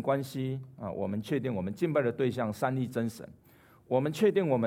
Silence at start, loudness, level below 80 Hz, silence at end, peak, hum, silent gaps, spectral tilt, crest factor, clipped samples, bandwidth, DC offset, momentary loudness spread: 0 s; -31 LUFS; -68 dBFS; 0 s; -14 dBFS; none; none; -7 dB/octave; 18 dB; under 0.1%; 16.5 kHz; under 0.1%; 10 LU